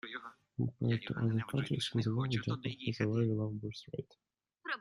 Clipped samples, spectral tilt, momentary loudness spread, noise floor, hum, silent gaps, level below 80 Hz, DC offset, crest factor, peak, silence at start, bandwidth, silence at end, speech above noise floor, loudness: under 0.1%; -6.5 dB/octave; 13 LU; -65 dBFS; none; none; -66 dBFS; under 0.1%; 16 dB; -20 dBFS; 0.05 s; 11.5 kHz; 0 s; 30 dB; -36 LUFS